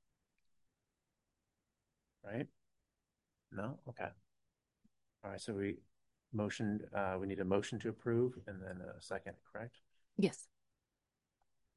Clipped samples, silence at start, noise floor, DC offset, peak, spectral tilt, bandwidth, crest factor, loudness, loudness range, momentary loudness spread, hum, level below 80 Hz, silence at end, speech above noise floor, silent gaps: under 0.1%; 2.25 s; -90 dBFS; under 0.1%; -20 dBFS; -6.5 dB/octave; 11.5 kHz; 24 dB; -42 LUFS; 11 LU; 14 LU; none; -68 dBFS; 1.3 s; 49 dB; none